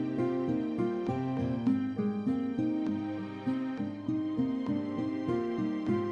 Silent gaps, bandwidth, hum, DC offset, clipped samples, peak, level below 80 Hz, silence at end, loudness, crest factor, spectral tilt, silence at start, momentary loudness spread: none; 6.8 kHz; none; under 0.1%; under 0.1%; -18 dBFS; -64 dBFS; 0 s; -32 LUFS; 14 dB; -9 dB/octave; 0 s; 4 LU